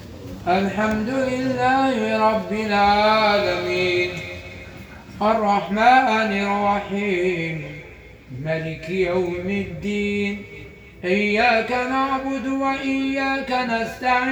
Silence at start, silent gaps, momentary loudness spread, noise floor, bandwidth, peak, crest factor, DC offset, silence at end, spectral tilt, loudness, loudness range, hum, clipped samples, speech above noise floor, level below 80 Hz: 0 s; none; 16 LU; -42 dBFS; over 20 kHz; -4 dBFS; 18 dB; under 0.1%; 0 s; -5.5 dB/octave; -21 LUFS; 6 LU; none; under 0.1%; 22 dB; -48 dBFS